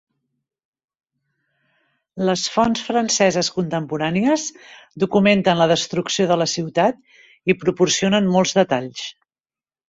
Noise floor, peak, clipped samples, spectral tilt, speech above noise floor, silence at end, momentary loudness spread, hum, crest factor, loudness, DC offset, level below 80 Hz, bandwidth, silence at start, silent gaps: under -90 dBFS; -2 dBFS; under 0.1%; -4 dB/octave; over 71 dB; 0.8 s; 9 LU; none; 18 dB; -19 LUFS; under 0.1%; -58 dBFS; 8 kHz; 2.15 s; none